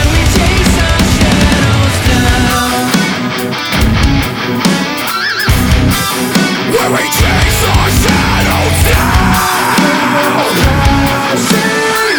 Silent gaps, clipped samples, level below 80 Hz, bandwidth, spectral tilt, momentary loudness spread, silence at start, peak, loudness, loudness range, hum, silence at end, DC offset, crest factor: none; under 0.1%; -18 dBFS; over 20 kHz; -4.5 dB/octave; 3 LU; 0 s; 0 dBFS; -10 LUFS; 2 LU; none; 0 s; under 0.1%; 10 dB